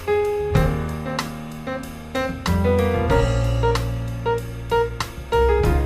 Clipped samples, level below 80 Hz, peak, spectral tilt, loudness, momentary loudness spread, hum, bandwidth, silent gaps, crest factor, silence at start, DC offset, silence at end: under 0.1%; -28 dBFS; -6 dBFS; -6.5 dB/octave; -22 LUFS; 11 LU; none; 15.5 kHz; none; 16 dB; 0 s; under 0.1%; 0 s